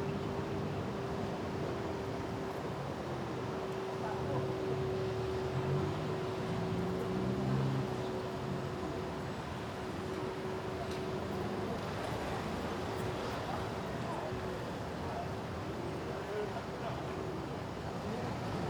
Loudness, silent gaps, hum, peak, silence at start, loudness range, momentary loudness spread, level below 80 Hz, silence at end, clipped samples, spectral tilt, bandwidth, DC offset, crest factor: -38 LUFS; none; none; -22 dBFS; 0 s; 4 LU; 5 LU; -56 dBFS; 0 s; under 0.1%; -6.5 dB/octave; over 20 kHz; under 0.1%; 14 dB